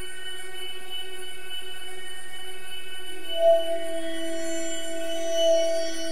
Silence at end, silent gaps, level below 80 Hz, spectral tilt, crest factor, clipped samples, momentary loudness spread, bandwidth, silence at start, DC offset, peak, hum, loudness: 0 s; none; -62 dBFS; -2.5 dB/octave; 18 dB; under 0.1%; 16 LU; 16 kHz; 0 s; 6%; -10 dBFS; none; -29 LUFS